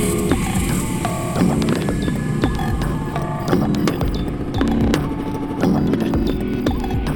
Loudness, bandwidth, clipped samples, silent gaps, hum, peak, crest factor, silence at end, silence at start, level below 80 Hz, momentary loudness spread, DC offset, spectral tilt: -20 LUFS; 19 kHz; under 0.1%; none; none; -2 dBFS; 16 dB; 0 s; 0 s; -28 dBFS; 5 LU; under 0.1%; -6 dB/octave